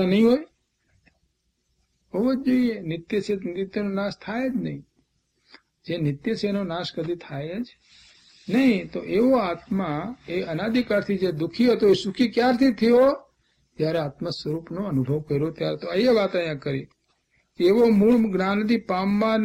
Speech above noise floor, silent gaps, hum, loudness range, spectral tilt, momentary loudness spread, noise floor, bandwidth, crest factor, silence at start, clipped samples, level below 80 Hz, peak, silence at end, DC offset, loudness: 50 dB; none; none; 8 LU; -7 dB/octave; 12 LU; -72 dBFS; 15.5 kHz; 16 dB; 0 s; under 0.1%; -56 dBFS; -8 dBFS; 0 s; under 0.1%; -23 LUFS